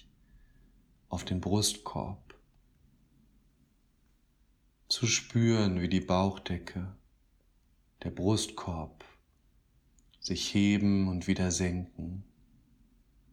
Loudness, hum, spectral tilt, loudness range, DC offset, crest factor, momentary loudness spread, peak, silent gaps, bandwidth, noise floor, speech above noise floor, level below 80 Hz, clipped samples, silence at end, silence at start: -31 LUFS; none; -4.5 dB/octave; 7 LU; under 0.1%; 20 dB; 15 LU; -14 dBFS; none; 15 kHz; -68 dBFS; 38 dB; -56 dBFS; under 0.1%; 1.1 s; 1.1 s